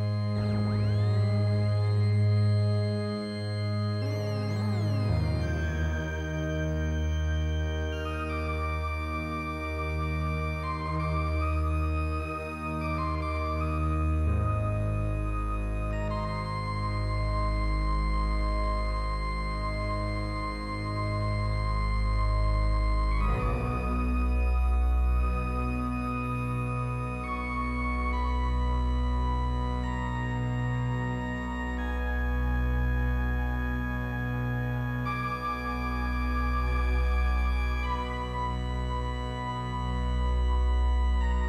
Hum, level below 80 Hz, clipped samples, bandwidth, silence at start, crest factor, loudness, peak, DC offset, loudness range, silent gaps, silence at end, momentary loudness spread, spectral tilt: none; -30 dBFS; under 0.1%; 10.5 kHz; 0 s; 12 dB; -30 LUFS; -16 dBFS; under 0.1%; 3 LU; none; 0 s; 5 LU; -7.5 dB/octave